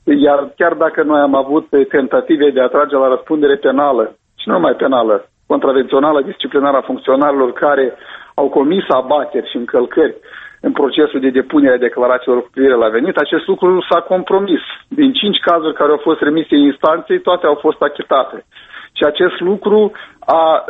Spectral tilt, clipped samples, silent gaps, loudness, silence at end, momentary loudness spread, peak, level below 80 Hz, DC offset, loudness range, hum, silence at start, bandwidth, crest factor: -8 dB/octave; under 0.1%; none; -13 LUFS; 0 s; 6 LU; 0 dBFS; -56 dBFS; under 0.1%; 2 LU; none; 0.05 s; 4 kHz; 12 dB